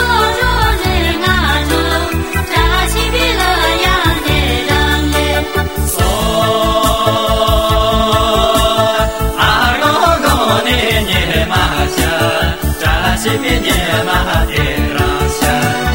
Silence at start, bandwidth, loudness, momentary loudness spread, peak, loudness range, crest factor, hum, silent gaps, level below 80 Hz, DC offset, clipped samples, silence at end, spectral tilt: 0 s; over 20 kHz; -12 LUFS; 3 LU; 0 dBFS; 2 LU; 12 dB; none; none; -20 dBFS; 1%; under 0.1%; 0 s; -4 dB/octave